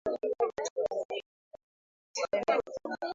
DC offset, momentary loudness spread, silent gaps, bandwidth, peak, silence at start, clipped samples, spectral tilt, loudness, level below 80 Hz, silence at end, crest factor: under 0.1%; 10 LU; 0.70-0.76 s, 1.05-1.09 s, 1.26-1.51 s, 1.63-2.14 s; 7.8 kHz; -14 dBFS; 0.05 s; under 0.1%; -2.5 dB/octave; -33 LUFS; -70 dBFS; 0 s; 20 dB